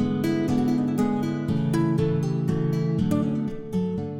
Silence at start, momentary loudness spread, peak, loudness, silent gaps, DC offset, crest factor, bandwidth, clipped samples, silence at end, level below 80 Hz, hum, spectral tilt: 0 s; 4 LU; -12 dBFS; -25 LUFS; none; under 0.1%; 12 dB; 16.5 kHz; under 0.1%; 0 s; -50 dBFS; none; -8.5 dB/octave